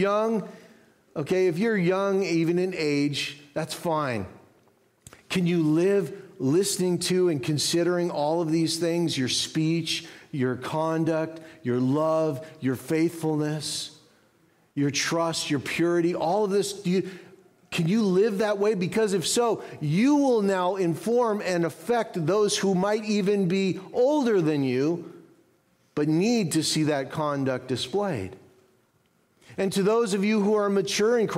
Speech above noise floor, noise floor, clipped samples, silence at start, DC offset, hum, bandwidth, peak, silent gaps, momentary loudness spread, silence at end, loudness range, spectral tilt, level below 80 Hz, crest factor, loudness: 42 dB; -66 dBFS; under 0.1%; 0 s; under 0.1%; none; 16 kHz; -12 dBFS; none; 8 LU; 0 s; 4 LU; -5 dB/octave; -68 dBFS; 12 dB; -25 LUFS